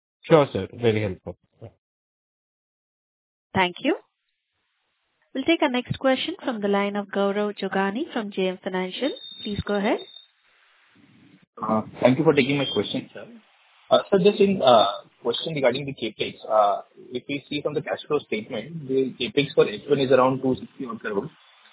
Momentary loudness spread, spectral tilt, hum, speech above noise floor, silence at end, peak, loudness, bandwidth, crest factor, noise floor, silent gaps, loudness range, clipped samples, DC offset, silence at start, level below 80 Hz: 12 LU; -10 dB/octave; none; 53 dB; 0.45 s; -2 dBFS; -24 LUFS; 4 kHz; 24 dB; -76 dBFS; 1.78-3.50 s, 11.47-11.53 s; 8 LU; under 0.1%; under 0.1%; 0.25 s; -56 dBFS